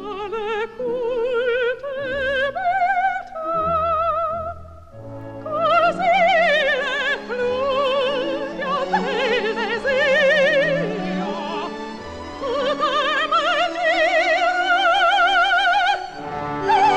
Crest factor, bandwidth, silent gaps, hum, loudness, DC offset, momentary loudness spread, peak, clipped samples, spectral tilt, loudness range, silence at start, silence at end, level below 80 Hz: 14 dB; 10 kHz; none; none; -19 LUFS; 0.1%; 12 LU; -6 dBFS; under 0.1%; -4 dB/octave; 5 LU; 0 s; 0 s; -48 dBFS